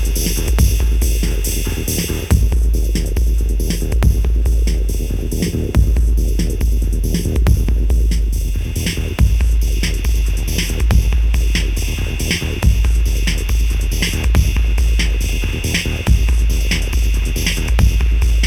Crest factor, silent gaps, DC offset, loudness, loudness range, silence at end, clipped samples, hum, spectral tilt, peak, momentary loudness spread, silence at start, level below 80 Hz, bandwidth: 14 dB; none; under 0.1%; -17 LUFS; 1 LU; 0 s; under 0.1%; none; -4.5 dB/octave; 0 dBFS; 5 LU; 0 s; -16 dBFS; 17 kHz